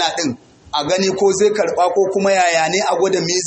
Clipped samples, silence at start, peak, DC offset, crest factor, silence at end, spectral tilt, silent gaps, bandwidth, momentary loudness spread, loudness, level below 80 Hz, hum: under 0.1%; 0 s; -4 dBFS; under 0.1%; 14 dB; 0 s; -3 dB/octave; none; 8.6 kHz; 8 LU; -16 LUFS; -56 dBFS; none